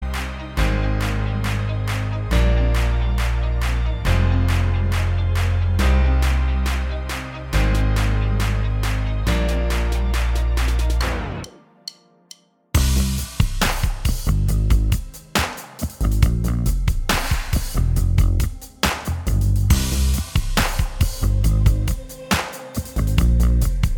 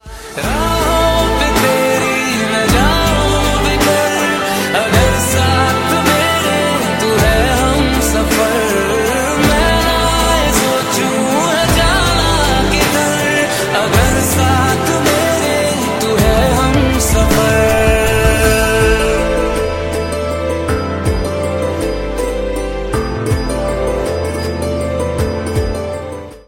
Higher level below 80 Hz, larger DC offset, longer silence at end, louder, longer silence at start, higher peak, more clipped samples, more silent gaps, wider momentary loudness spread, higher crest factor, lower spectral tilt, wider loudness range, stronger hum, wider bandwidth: about the same, -20 dBFS vs -22 dBFS; neither; about the same, 0 s vs 0.1 s; second, -21 LUFS vs -13 LUFS; about the same, 0 s vs 0.05 s; about the same, -2 dBFS vs 0 dBFS; neither; neither; about the same, 7 LU vs 7 LU; about the same, 18 dB vs 14 dB; about the same, -5 dB/octave vs -4 dB/octave; second, 3 LU vs 6 LU; neither; first, 19 kHz vs 16.5 kHz